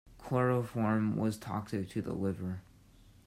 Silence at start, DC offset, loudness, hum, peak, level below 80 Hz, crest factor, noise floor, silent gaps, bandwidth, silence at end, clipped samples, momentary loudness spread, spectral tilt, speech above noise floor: 0.05 s; under 0.1%; -34 LUFS; none; -18 dBFS; -62 dBFS; 16 dB; -60 dBFS; none; 15.5 kHz; 0.65 s; under 0.1%; 9 LU; -8 dB/octave; 27 dB